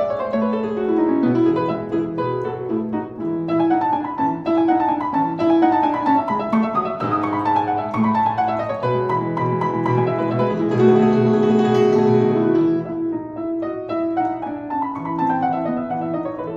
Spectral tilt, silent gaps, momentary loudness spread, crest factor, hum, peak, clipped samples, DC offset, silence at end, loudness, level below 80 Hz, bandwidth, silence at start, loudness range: -9 dB/octave; none; 9 LU; 16 dB; none; -4 dBFS; under 0.1%; under 0.1%; 0 s; -19 LUFS; -54 dBFS; 7.6 kHz; 0 s; 5 LU